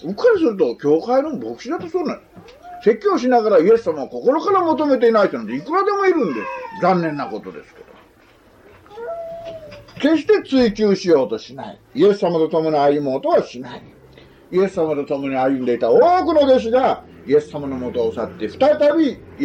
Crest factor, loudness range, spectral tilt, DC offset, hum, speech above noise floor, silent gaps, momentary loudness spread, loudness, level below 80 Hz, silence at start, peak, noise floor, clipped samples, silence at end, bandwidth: 14 dB; 6 LU; -6.5 dB/octave; under 0.1%; none; 33 dB; none; 16 LU; -18 LUFS; -54 dBFS; 0 s; -4 dBFS; -50 dBFS; under 0.1%; 0 s; 8.2 kHz